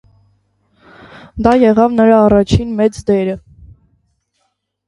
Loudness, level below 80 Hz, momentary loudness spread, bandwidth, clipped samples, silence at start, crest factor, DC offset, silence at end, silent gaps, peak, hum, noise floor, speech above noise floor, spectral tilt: -12 LUFS; -34 dBFS; 10 LU; 11 kHz; under 0.1%; 1.35 s; 14 dB; under 0.1%; 1.5 s; none; 0 dBFS; none; -67 dBFS; 56 dB; -7.5 dB/octave